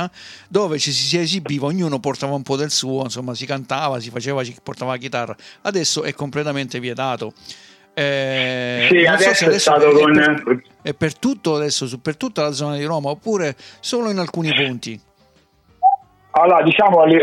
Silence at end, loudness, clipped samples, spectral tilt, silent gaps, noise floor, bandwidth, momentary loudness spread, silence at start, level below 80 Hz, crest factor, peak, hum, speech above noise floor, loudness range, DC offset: 0 s; -18 LUFS; under 0.1%; -4 dB/octave; none; -56 dBFS; 14.5 kHz; 14 LU; 0 s; -62 dBFS; 16 dB; -2 dBFS; none; 38 dB; 9 LU; under 0.1%